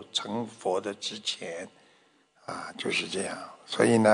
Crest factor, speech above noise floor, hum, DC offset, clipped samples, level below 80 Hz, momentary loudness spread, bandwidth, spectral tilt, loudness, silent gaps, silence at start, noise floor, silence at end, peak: 22 dB; 35 dB; none; under 0.1%; under 0.1%; -74 dBFS; 15 LU; 10.5 kHz; -4 dB/octave; -30 LUFS; none; 0 s; -64 dBFS; 0 s; -8 dBFS